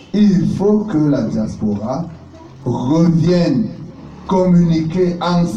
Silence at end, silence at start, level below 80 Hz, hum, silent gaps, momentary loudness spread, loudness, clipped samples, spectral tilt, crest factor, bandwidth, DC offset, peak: 0 s; 0 s; -40 dBFS; none; none; 12 LU; -15 LUFS; under 0.1%; -8.5 dB/octave; 12 dB; 7.6 kHz; under 0.1%; -4 dBFS